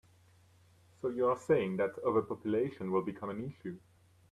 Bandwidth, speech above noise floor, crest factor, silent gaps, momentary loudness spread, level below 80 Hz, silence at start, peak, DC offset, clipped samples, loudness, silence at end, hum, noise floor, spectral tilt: 12 kHz; 31 dB; 18 dB; none; 13 LU; -72 dBFS; 1.05 s; -18 dBFS; under 0.1%; under 0.1%; -34 LUFS; 0.55 s; none; -64 dBFS; -8 dB/octave